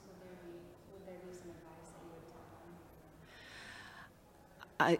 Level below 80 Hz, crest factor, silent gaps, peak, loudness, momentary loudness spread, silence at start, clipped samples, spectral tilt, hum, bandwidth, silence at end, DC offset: -70 dBFS; 28 dB; none; -16 dBFS; -49 LUFS; 7 LU; 0 s; under 0.1%; -5.5 dB/octave; none; 16 kHz; 0 s; under 0.1%